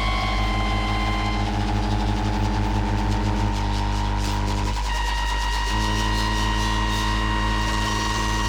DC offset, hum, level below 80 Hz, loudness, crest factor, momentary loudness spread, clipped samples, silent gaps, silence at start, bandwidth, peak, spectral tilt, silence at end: under 0.1%; 50 Hz at -25 dBFS; -26 dBFS; -24 LUFS; 12 dB; 2 LU; under 0.1%; none; 0 s; 15.5 kHz; -10 dBFS; -4.5 dB/octave; 0 s